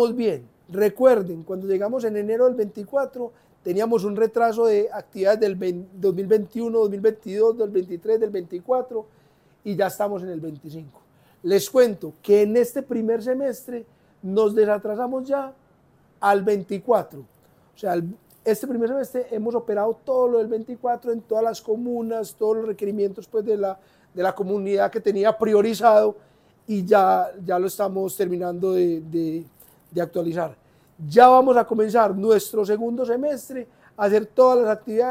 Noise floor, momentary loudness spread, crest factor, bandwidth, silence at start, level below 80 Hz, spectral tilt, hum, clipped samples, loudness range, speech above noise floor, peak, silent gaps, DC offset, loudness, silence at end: -58 dBFS; 14 LU; 20 dB; 16 kHz; 0 s; -68 dBFS; -6 dB/octave; none; under 0.1%; 6 LU; 37 dB; 0 dBFS; none; under 0.1%; -22 LUFS; 0 s